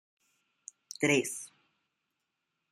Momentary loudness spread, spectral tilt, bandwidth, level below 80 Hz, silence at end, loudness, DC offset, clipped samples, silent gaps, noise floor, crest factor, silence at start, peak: 24 LU; -3.5 dB/octave; 15.5 kHz; -78 dBFS; 1.25 s; -30 LUFS; under 0.1%; under 0.1%; none; -84 dBFS; 24 dB; 1 s; -12 dBFS